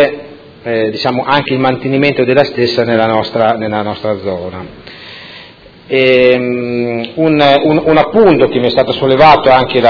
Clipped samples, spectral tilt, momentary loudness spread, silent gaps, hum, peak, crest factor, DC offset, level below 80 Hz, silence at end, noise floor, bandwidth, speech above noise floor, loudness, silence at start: 0.9%; -7.5 dB/octave; 19 LU; none; none; 0 dBFS; 10 dB; under 0.1%; -42 dBFS; 0 s; -37 dBFS; 5.4 kHz; 26 dB; -11 LUFS; 0 s